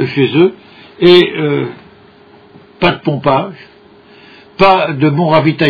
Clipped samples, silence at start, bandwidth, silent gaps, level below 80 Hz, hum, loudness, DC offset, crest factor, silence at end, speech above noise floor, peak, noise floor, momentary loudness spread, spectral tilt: 0.3%; 0 s; 5.4 kHz; none; -46 dBFS; none; -11 LUFS; under 0.1%; 12 dB; 0 s; 31 dB; 0 dBFS; -42 dBFS; 8 LU; -8.5 dB/octave